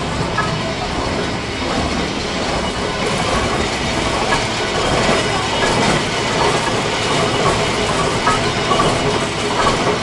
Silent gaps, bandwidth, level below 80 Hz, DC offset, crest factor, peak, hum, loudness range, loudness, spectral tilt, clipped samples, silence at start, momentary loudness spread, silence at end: none; 11.5 kHz; -32 dBFS; under 0.1%; 16 dB; -2 dBFS; none; 3 LU; -17 LUFS; -4 dB/octave; under 0.1%; 0 s; 5 LU; 0 s